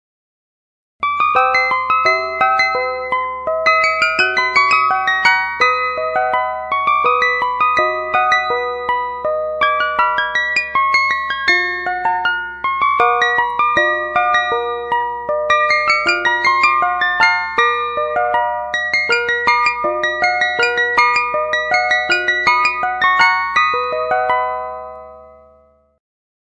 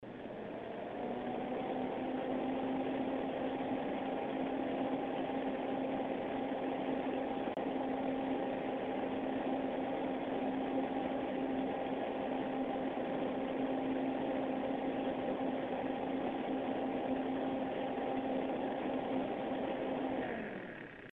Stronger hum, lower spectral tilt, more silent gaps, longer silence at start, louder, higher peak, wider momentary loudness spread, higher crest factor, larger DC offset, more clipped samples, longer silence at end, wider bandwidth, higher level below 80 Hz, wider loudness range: neither; second, -2 dB/octave vs -8.5 dB/octave; neither; first, 1 s vs 0 s; first, -15 LUFS vs -38 LUFS; first, 0 dBFS vs -24 dBFS; first, 7 LU vs 2 LU; about the same, 16 dB vs 14 dB; neither; neither; first, 1.1 s vs 0 s; first, 10.5 kHz vs 4.2 kHz; first, -50 dBFS vs -66 dBFS; about the same, 2 LU vs 1 LU